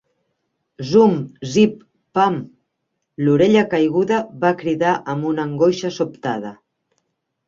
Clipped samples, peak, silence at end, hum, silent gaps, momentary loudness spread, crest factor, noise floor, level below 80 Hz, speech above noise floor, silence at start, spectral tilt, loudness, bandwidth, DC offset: under 0.1%; -2 dBFS; 0.95 s; none; none; 11 LU; 16 dB; -75 dBFS; -60 dBFS; 58 dB; 0.8 s; -6.5 dB/octave; -18 LUFS; 7.6 kHz; under 0.1%